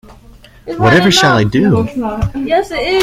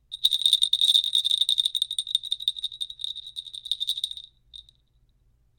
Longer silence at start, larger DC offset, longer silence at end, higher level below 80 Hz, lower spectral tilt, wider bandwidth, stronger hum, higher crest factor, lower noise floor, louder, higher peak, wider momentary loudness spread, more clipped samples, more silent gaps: about the same, 0.1 s vs 0.1 s; neither; second, 0 s vs 0.95 s; first, -34 dBFS vs -66 dBFS; first, -5 dB/octave vs 4 dB/octave; about the same, 15.5 kHz vs 17 kHz; second, none vs 60 Hz at -75 dBFS; second, 12 dB vs 22 dB; second, -40 dBFS vs -64 dBFS; first, -12 LUFS vs -23 LUFS; first, 0 dBFS vs -6 dBFS; second, 10 LU vs 16 LU; neither; neither